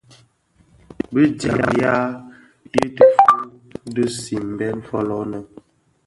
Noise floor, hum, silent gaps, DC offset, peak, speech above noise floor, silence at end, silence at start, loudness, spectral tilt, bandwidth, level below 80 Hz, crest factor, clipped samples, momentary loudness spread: -57 dBFS; none; none; under 0.1%; 0 dBFS; 39 dB; 0.6 s; 1.1 s; -18 LUFS; -6 dB/octave; 11.5 kHz; -52 dBFS; 20 dB; under 0.1%; 17 LU